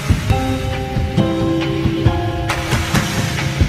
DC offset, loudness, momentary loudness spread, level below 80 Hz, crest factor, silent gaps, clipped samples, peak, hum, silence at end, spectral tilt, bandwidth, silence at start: under 0.1%; -18 LUFS; 3 LU; -26 dBFS; 16 dB; none; under 0.1%; 0 dBFS; none; 0 s; -5.5 dB/octave; 15.5 kHz; 0 s